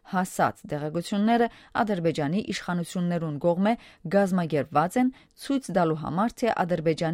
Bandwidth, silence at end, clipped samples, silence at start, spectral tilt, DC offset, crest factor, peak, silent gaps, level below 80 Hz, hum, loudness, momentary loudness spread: 16 kHz; 0 s; under 0.1%; 0.05 s; -6.5 dB/octave; under 0.1%; 18 dB; -8 dBFS; none; -58 dBFS; none; -26 LUFS; 6 LU